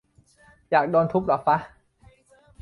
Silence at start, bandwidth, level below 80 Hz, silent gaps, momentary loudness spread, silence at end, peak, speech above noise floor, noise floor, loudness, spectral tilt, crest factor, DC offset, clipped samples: 0.7 s; 11 kHz; -58 dBFS; none; 3 LU; 0.95 s; -6 dBFS; 36 dB; -57 dBFS; -23 LUFS; -8.5 dB/octave; 20 dB; under 0.1%; under 0.1%